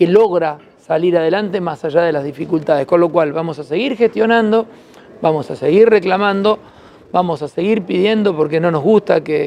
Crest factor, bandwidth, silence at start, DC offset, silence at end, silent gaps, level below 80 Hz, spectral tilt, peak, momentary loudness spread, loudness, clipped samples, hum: 14 dB; 9.6 kHz; 0 s; under 0.1%; 0 s; none; -58 dBFS; -7.5 dB/octave; 0 dBFS; 9 LU; -15 LUFS; under 0.1%; none